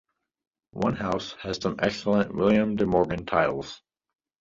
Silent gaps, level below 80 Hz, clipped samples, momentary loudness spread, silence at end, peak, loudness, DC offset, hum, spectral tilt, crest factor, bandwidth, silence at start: none; -52 dBFS; under 0.1%; 12 LU; 0.65 s; -8 dBFS; -26 LUFS; under 0.1%; none; -6.5 dB/octave; 18 dB; 7.6 kHz; 0.75 s